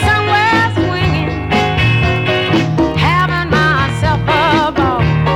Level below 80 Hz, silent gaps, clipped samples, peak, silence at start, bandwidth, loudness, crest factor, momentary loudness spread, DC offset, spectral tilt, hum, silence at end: -28 dBFS; none; under 0.1%; -2 dBFS; 0 s; 12.5 kHz; -13 LUFS; 12 dB; 3 LU; under 0.1%; -6 dB/octave; none; 0 s